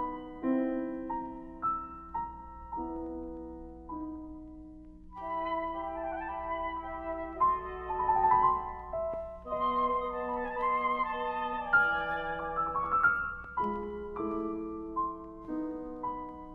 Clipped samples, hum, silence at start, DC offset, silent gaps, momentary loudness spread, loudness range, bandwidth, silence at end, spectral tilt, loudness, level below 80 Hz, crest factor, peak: under 0.1%; 60 Hz at -55 dBFS; 0 s; under 0.1%; none; 16 LU; 9 LU; 4.9 kHz; 0 s; -8 dB/octave; -33 LUFS; -52 dBFS; 18 dB; -14 dBFS